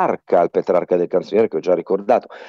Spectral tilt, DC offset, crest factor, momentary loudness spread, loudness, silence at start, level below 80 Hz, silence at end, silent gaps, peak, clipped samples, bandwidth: -7.5 dB/octave; under 0.1%; 14 dB; 2 LU; -18 LUFS; 0 s; -66 dBFS; 0 s; none; -4 dBFS; under 0.1%; 7 kHz